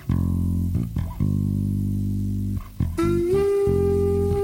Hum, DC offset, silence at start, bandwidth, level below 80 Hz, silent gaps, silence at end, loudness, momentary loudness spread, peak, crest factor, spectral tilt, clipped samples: none; under 0.1%; 0 s; 16.5 kHz; -34 dBFS; none; 0 s; -23 LUFS; 7 LU; -10 dBFS; 12 dB; -9 dB/octave; under 0.1%